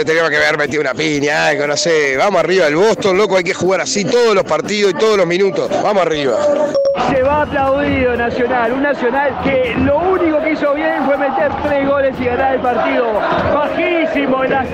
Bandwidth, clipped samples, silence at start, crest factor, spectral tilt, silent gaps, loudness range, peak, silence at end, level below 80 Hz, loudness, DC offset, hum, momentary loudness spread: 12 kHz; under 0.1%; 0 s; 8 dB; -4.5 dB/octave; none; 2 LU; -6 dBFS; 0 s; -40 dBFS; -14 LUFS; under 0.1%; none; 3 LU